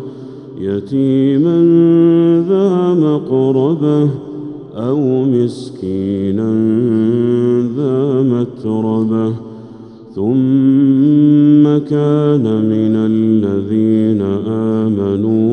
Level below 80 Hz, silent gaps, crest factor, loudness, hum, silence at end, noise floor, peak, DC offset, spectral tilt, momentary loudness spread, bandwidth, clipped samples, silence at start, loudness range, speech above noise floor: -58 dBFS; none; 12 dB; -13 LUFS; none; 0 s; -34 dBFS; 0 dBFS; under 0.1%; -10 dB/octave; 11 LU; 8.8 kHz; under 0.1%; 0 s; 4 LU; 22 dB